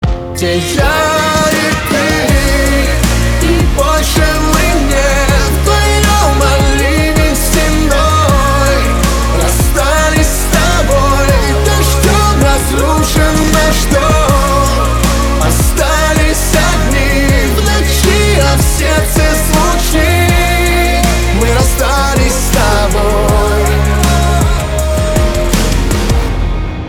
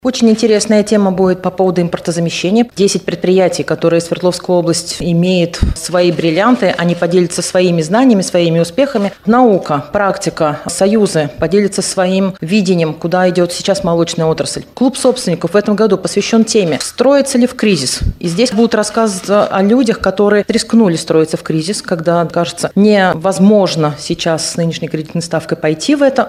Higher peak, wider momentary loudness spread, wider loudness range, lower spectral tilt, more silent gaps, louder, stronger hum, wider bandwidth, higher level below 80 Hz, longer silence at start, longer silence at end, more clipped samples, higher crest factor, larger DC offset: about the same, 0 dBFS vs 0 dBFS; second, 3 LU vs 6 LU; about the same, 1 LU vs 2 LU; about the same, -4.5 dB/octave vs -5 dB/octave; neither; about the same, -11 LUFS vs -12 LUFS; neither; first, 19 kHz vs 15 kHz; first, -14 dBFS vs -34 dBFS; about the same, 0 s vs 0.05 s; about the same, 0 s vs 0 s; neither; about the same, 10 dB vs 12 dB; neither